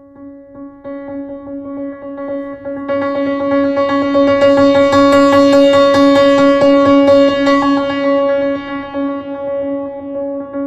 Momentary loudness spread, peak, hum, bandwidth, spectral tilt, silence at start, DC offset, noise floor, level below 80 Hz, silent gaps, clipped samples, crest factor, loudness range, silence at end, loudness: 17 LU; -2 dBFS; none; 10 kHz; -5.5 dB/octave; 0.2 s; under 0.1%; -35 dBFS; -46 dBFS; none; under 0.1%; 12 dB; 11 LU; 0 s; -12 LUFS